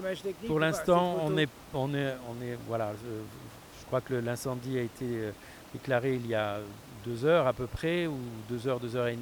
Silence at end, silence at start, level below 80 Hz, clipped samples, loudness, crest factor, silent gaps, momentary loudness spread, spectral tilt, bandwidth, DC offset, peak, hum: 0 s; 0 s; -58 dBFS; under 0.1%; -32 LUFS; 18 dB; none; 15 LU; -6 dB/octave; over 20 kHz; under 0.1%; -12 dBFS; none